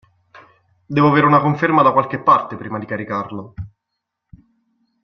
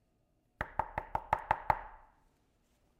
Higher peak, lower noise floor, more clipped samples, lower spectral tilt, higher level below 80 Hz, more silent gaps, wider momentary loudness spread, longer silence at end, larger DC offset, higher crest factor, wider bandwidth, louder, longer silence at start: first, 0 dBFS vs -12 dBFS; about the same, -78 dBFS vs -75 dBFS; neither; first, -8.5 dB/octave vs -6 dB/octave; about the same, -54 dBFS vs -54 dBFS; neither; first, 18 LU vs 9 LU; first, 1.35 s vs 1 s; neither; second, 18 dB vs 28 dB; second, 6.4 kHz vs 16 kHz; first, -16 LUFS vs -37 LUFS; first, 0.9 s vs 0.6 s